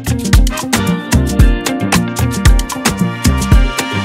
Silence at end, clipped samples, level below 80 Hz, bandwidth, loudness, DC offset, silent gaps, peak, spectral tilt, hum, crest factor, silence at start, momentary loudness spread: 0 s; under 0.1%; -14 dBFS; 16.5 kHz; -13 LUFS; under 0.1%; none; 0 dBFS; -5 dB/octave; none; 12 dB; 0 s; 3 LU